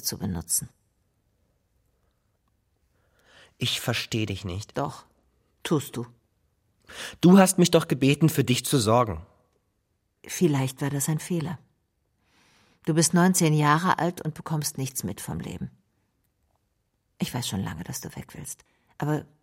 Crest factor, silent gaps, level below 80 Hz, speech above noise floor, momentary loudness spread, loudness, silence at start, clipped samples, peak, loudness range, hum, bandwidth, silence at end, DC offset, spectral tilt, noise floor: 22 dB; none; -56 dBFS; 49 dB; 18 LU; -25 LUFS; 0 s; under 0.1%; -6 dBFS; 13 LU; none; 16.5 kHz; 0.2 s; under 0.1%; -5 dB/octave; -74 dBFS